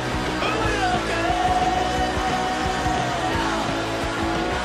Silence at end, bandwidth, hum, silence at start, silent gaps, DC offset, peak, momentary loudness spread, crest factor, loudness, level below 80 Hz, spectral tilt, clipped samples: 0 s; 14.5 kHz; none; 0 s; none; under 0.1%; -8 dBFS; 3 LU; 14 dB; -23 LUFS; -36 dBFS; -4.5 dB/octave; under 0.1%